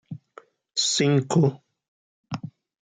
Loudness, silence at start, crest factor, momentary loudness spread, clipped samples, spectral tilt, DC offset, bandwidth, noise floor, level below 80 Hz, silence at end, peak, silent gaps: -22 LUFS; 0.1 s; 18 dB; 21 LU; under 0.1%; -4.5 dB/octave; under 0.1%; 9.6 kHz; -52 dBFS; -68 dBFS; 0.35 s; -8 dBFS; 1.88-2.24 s